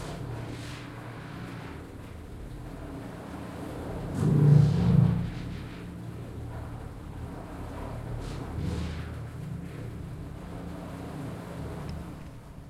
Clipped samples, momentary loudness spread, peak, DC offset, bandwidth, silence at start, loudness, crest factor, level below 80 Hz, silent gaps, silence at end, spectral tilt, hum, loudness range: under 0.1%; 19 LU; -8 dBFS; under 0.1%; 12.5 kHz; 0 s; -32 LUFS; 22 dB; -46 dBFS; none; 0 s; -8 dB/octave; none; 14 LU